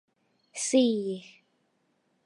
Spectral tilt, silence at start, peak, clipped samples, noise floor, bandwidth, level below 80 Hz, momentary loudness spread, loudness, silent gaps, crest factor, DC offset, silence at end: -3.5 dB/octave; 0.55 s; -12 dBFS; under 0.1%; -73 dBFS; 11.5 kHz; -84 dBFS; 17 LU; -27 LUFS; none; 18 dB; under 0.1%; 1.05 s